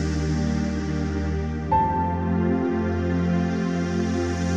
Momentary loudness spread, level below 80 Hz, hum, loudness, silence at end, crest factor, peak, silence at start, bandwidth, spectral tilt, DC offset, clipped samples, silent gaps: 4 LU; -34 dBFS; none; -24 LUFS; 0 s; 14 dB; -10 dBFS; 0 s; 8.6 kHz; -7.5 dB/octave; under 0.1%; under 0.1%; none